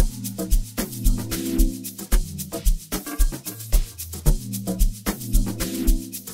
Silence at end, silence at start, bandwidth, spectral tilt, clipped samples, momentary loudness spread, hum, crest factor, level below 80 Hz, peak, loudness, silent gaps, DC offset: 0 s; 0 s; 16.5 kHz; -4.5 dB/octave; under 0.1%; 4 LU; none; 18 dB; -24 dBFS; -4 dBFS; -26 LUFS; none; under 0.1%